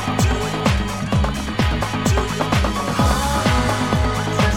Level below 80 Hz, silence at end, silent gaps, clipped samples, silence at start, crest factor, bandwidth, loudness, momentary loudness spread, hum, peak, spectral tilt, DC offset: -26 dBFS; 0 s; none; under 0.1%; 0 s; 16 dB; 17 kHz; -19 LUFS; 3 LU; none; -2 dBFS; -5 dB/octave; 0.7%